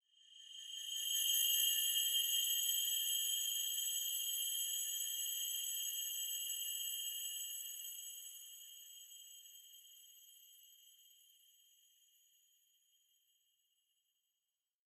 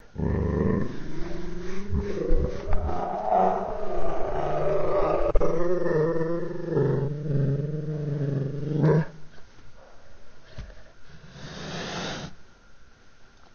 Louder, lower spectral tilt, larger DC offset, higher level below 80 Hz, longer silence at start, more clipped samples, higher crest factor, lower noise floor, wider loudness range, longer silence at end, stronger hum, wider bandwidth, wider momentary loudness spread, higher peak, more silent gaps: second, -37 LUFS vs -28 LUFS; second, 10.5 dB/octave vs -8 dB/octave; neither; second, under -90 dBFS vs -34 dBFS; first, 0.3 s vs 0.15 s; neither; about the same, 20 dB vs 20 dB; first, under -90 dBFS vs -49 dBFS; first, 21 LU vs 13 LU; first, 3.95 s vs 0.1 s; neither; first, 15 kHz vs 7 kHz; first, 21 LU vs 13 LU; second, -24 dBFS vs -4 dBFS; neither